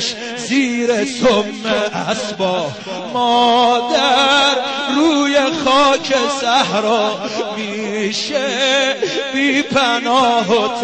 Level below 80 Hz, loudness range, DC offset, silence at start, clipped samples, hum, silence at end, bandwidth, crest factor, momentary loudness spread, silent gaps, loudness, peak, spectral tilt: -54 dBFS; 3 LU; 0.1%; 0 s; under 0.1%; none; 0 s; 8.8 kHz; 12 dB; 9 LU; none; -15 LUFS; -2 dBFS; -3 dB/octave